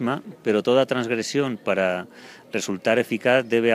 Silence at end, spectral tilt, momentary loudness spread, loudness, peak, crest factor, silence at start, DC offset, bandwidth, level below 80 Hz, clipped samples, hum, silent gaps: 0 s; -4.5 dB/octave; 9 LU; -23 LUFS; -4 dBFS; 18 dB; 0 s; under 0.1%; 15.5 kHz; -72 dBFS; under 0.1%; none; none